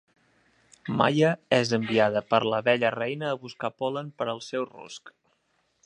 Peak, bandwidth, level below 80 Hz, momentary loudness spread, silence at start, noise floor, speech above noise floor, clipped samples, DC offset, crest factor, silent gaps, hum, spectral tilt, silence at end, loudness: -4 dBFS; 11 kHz; -70 dBFS; 13 LU; 0.85 s; -72 dBFS; 46 dB; under 0.1%; under 0.1%; 22 dB; none; none; -5.5 dB/octave; 0.75 s; -26 LUFS